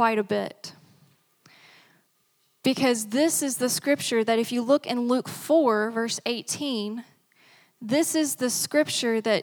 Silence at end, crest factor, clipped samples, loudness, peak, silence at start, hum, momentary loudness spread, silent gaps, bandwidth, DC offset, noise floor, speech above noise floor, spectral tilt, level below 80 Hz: 0 s; 18 dB; under 0.1%; -25 LUFS; -8 dBFS; 0 s; none; 7 LU; none; 20 kHz; under 0.1%; -68 dBFS; 44 dB; -3 dB/octave; -80 dBFS